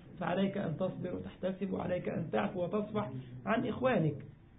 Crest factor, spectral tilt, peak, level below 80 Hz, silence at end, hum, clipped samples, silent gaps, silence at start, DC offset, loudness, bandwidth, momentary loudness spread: 16 dB; -5 dB/octave; -18 dBFS; -62 dBFS; 0 s; none; under 0.1%; none; 0 s; under 0.1%; -35 LUFS; 3.9 kHz; 9 LU